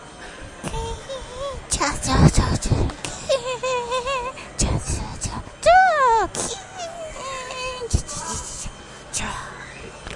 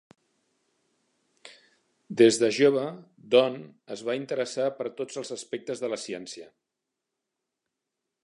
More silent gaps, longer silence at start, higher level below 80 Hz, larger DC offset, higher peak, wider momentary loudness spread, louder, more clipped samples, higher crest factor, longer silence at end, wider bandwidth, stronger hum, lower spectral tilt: neither; second, 0 s vs 1.45 s; first, -32 dBFS vs -80 dBFS; neither; first, -2 dBFS vs -6 dBFS; about the same, 17 LU vs 18 LU; first, -23 LUFS vs -26 LUFS; neither; about the same, 22 dB vs 24 dB; second, 0 s vs 1.8 s; about the same, 11.5 kHz vs 11 kHz; neither; about the same, -4 dB/octave vs -4 dB/octave